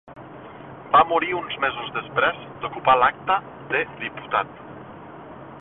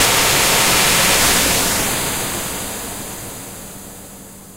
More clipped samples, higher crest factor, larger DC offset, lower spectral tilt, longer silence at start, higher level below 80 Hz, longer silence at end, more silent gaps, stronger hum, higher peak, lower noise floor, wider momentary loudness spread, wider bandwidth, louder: neither; about the same, 20 dB vs 16 dB; neither; first, -8.5 dB/octave vs -1 dB/octave; about the same, 0.05 s vs 0 s; second, -56 dBFS vs -36 dBFS; about the same, 0 s vs 0 s; neither; neither; about the same, -4 dBFS vs -2 dBFS; about the same, -40 dBFS vs -37 dBFS; about the same, 23 LU vs 21 LU; second, 4.1 kHz vs 16 kHz; second, -22 LUFS vs -14 LUFS